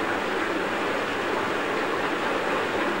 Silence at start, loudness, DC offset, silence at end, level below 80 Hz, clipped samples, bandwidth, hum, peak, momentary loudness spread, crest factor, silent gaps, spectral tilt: 0 s; -26 LUFS; 0.4%; 0 s; -60 dBFS; under 0.1%; 16 kHz; none; -12 dBFS; 1 LU; 14 dB; none; -4 dB/octave